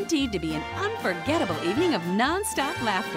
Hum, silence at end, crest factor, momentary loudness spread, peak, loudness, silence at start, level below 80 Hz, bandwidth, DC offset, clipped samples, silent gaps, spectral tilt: none; 0 s; 16 dB; 5 LU; -10 dBFS; -26 LUFS; 0 s; -48 dBFS; 16 kHz; under 0.1%; under 0.1%; none; -4 dB/octave